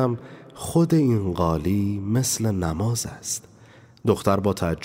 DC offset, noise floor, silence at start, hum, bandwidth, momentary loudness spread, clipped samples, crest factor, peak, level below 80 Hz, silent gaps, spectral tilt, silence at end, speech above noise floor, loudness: under 0.1%; -50 dBFS; 0 s; none; 16 kHz; 9 LU; under 0.1%; 18 dB; -6 dBFS; -48 dBFS; none; -6 dB/octave; 0 s; 27 dB; -23 LUFS